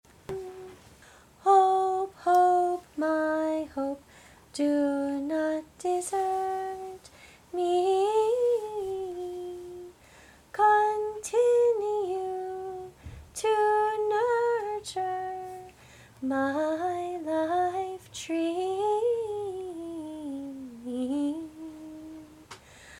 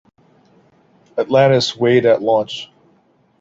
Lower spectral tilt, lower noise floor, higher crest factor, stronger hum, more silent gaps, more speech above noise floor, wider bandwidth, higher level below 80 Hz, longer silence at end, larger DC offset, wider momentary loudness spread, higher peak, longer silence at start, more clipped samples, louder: about the same, -4.5 dB/octave vs -5.5 dB/octave; about the same, -55 dBFS vs -57 dBFS; about the same, 18 dB vs 16 dB; neither; neither; second, 28 dB vs 42 dB; first, 16 kHz vs 7.8 kHz; about the same, -62 dBFS vs -60 dBFS; second, 0 s vs 0.75 s; neither; first, 20 LU vs 15 LU; second, -10 dBFS vs -2 dBFS; second, 0.3 s vs 1.15 s; neither; second, -28 LUFS vs -15 LUFS